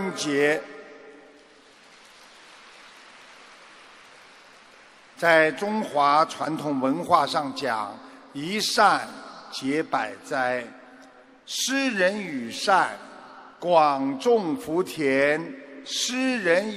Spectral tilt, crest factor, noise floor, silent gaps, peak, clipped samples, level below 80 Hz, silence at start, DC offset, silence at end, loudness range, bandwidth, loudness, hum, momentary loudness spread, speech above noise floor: -3.5 dB/octave; 22 dB; -53 dBFS; none; -4 dBFS; under 0.1%; -72 dBFS; 0 s; under 0.1%; 0 s; 4 LU; 15.5 kHz; -24 LUFS; none; 18 LU; 29 dB